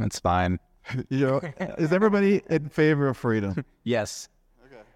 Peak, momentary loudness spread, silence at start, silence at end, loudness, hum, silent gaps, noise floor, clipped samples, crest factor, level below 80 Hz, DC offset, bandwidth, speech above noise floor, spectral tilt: -8 dBFS; 13 LU; 0 s; 0.15 s; -25 LUFS; none; none; -52 dBFS; under 0.1%; 18 dB; -52 dBFS; under 0.1%; 15 kHz; 28 dB; -6.5 dB/octave